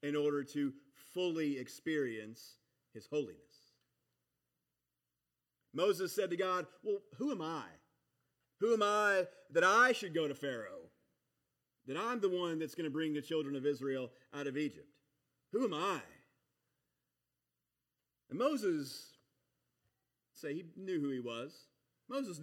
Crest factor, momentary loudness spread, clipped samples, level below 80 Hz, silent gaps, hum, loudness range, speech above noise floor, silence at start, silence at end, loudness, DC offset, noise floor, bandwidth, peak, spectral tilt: 22 dB; 15 LU; under 0.1%; under -90 dBFS; none; none; 11 LU; 53 dB; 0.05 s; 0 s; -37 LUFS; under 0.1%; -89 dBFS; 17 kHz; -18 dBFS; -4.5 dB/octave